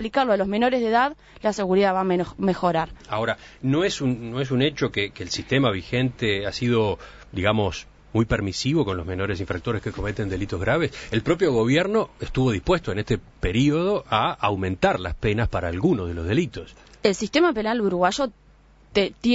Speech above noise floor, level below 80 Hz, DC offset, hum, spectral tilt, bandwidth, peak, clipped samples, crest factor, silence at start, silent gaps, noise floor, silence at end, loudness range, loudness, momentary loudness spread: 30 dB; -42 dBFS; under 0.1%; none; -6 dB/octave; 8 kHz; -4 dBFS; under 0.1%; 20 dB; 0 s; none; -53 dBFS; 0 s; 2 LU; -23 LUFS; 7 LU